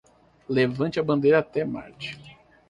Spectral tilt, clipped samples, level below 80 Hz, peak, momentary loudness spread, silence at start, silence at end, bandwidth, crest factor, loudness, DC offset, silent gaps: -7.5 dB/octave; under 0.1%; -60 dBFS; -8 dBFS; 16 LU; 0.5 s; 0.4 s; 10 kHz; 18 dB; -24 LUFS; under 0.1%; none